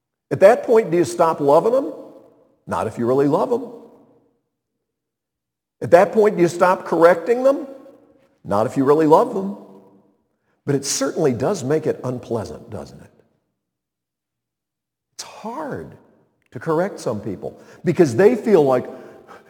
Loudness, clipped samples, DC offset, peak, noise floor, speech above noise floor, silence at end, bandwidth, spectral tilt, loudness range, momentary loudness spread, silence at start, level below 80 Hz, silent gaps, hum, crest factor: -18 LUFS; under 0.1%; under 0.1%; 0 dBFS; -84 dBFS; 67 dB; 0.1 s; 18.5 kHz; -6 dB/octave; 16 LU; 19 LU; 0.3 s; -62 dBFS; none; none; 20 dB